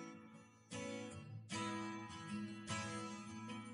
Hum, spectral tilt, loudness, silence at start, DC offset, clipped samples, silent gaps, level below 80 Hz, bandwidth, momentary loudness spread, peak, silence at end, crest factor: none; -4 dB/octave; -47 LUFS; 0 s; under 0.1%; under 0.1%; none; -80 dBFS; 10.5 kHz; 10 LU; -32 dBFS; 0 s; 18 dB